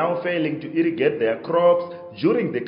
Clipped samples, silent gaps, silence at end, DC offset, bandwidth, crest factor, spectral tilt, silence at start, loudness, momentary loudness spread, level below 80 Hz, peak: under 0.1%; none; 0 s; under 0.1%; 5.4 kHz; 14 dB; -5 dB/octave; 0 s; -21 LUFS; 6 LU; -70 dBFS; -6 dBFS